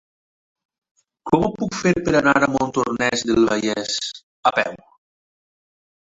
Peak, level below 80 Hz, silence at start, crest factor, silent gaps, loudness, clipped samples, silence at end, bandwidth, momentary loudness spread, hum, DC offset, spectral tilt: -2 dBFS; -50 dBFS; 1.25 s; 20 dB; 4.23-4.43 s; -20 LUFS; under 0.1%; 1.3 s; 8 kHz; 8 LU; none; under 0.1%; -4.5 dB/octave